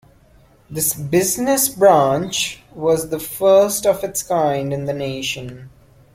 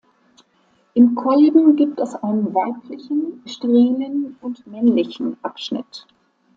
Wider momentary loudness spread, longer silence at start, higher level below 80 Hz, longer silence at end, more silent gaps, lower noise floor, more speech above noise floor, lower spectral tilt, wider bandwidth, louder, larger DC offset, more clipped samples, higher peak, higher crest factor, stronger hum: second, 11 LU vs 15 LU; second, 0.7 s vs 0.95 s; first, -52 dBFS vs -68 dBFS; about the same, 0.45 s vs 0.55 s; neither; second, -51 dBFS vs -60 dBFS; second, 33 dB vs 42 dB; second, -4 dB/octave vs -7 dB/octave; first, 16.5 kHz vs 7.6 kHz; about the same, -18 LUFS vs -18 LUFS; neither; neither; about the same, -2 dBFS vs -2 dBFS; about the same, 18 dB vs 16 dB; neither